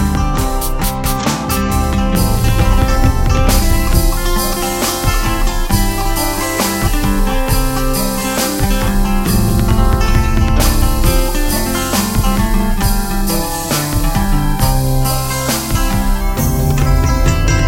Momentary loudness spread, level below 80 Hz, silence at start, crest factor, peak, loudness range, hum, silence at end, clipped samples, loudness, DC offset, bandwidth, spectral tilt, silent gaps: 3 LU; -16 dBFS; 0 s; 12 dB; 0 dBFS; 2 LU; none; 0 s; under 0.1%; -15 LUFS; under 0.1%; 17 kHz; -4.5 dB/octave; none